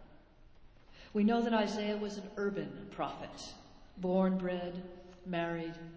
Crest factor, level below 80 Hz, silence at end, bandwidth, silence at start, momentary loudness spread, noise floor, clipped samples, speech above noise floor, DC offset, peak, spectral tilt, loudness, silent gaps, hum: 18 dB; -62 dBFS; 0 s; 8 kHz; 0 s; 17 LU; -58 dBFS; under 0.1%; 23 dB; under 0.1%; -18 dBFS; -6.5 dB/octave; -35 LUFS; none; none